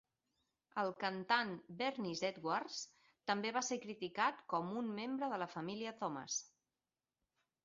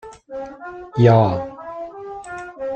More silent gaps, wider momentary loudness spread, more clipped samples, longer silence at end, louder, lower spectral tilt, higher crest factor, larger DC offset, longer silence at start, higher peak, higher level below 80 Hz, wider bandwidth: neither; second, 9 LU vs 20 LU; neither; first, 1.2 s vs 0 s; second, -41 LUFS vs -17 LUFS; second, -2.5 dB/octave vs -8.5 dB/octave; first, 24 dB vs 18 dB; neither; first, 0.75 s vs 0.05 s; second, -18 dBFS vs -2 dBFS; second, -86 dBFS vs -52 dBFS; second, 7.4 kHz vs 8.6 kHz